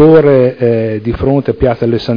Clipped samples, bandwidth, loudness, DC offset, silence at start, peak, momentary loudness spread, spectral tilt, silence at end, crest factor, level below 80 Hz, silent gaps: 1%; 5.2 kHz; -11 LUFS; under 0.1%; 0 s; 0 dBFS; 8 LU; -10 dB/octave; 0 s; 10 dB; -32 dBFS; none